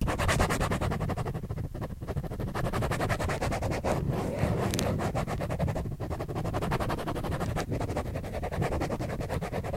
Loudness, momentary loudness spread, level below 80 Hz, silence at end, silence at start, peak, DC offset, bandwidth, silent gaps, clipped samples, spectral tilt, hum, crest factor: -32 LUFS; 7 LU; -38 dBFS; 0 s; 0 s; -8 dBFS; under 0.1%; 16.5 kHz; none; under 0.1%; -6 dB/octave; none; 24 dB